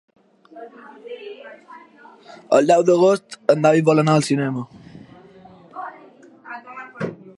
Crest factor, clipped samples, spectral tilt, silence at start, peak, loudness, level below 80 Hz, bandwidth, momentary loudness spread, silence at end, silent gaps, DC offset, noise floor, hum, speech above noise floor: 20 dB; under 0.1%; -6.5 dB/octave; 0.55 s; -2 dBFS; -17 LUFS; -68 dBFS; 11.5 kHz; 25 LU; 0.05 s; none; under 0.1%; -47 dBFS; none; 28 dB